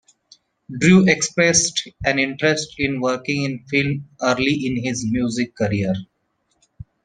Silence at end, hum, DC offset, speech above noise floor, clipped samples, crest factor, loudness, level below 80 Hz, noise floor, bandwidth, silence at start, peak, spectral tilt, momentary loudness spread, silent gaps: 1 s; none; under 0.1%; 49 dB; under 0.1%; 20 dB; -19 LUFS; -50 dBFS; -69 dBFS; 10 kHz; 0.7 s; -2 dBFS; -4 dB/octave; 9 LU; none